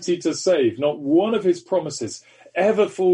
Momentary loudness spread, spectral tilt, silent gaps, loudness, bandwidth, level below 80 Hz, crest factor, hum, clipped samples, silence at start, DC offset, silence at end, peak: 11 LU; -5 dB/octave; none; -21 LUFS; 10.5 kHz; -68 dBFS; 14 dB; none; under 0.1%; 0 s; under 0.1%; 0 s; -6 dBFS